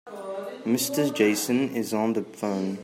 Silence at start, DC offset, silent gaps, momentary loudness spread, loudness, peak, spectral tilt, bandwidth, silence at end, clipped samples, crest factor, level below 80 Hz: 0.05 s; under 0.1%; none; 12 LU; -26 LUFS; -8 dBFS; -4.5 dB/octave; 16 kHz; 0 s; under 0.1%; 18 dB; -74 dBFS